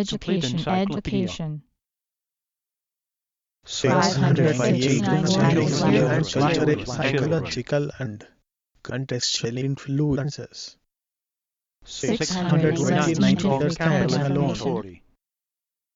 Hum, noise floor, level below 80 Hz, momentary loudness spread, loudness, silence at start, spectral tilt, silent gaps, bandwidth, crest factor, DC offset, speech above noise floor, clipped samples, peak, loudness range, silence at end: none; -89 dBFS; -50 dBFS; 14 LU; -22 LUFS; 0 s; -5.5 dB/octave; none; 7.8 kHz; 18 dB; under 0.1%; 67 dB; under 0.1%; -6 dBFS; 8 LU; 1 s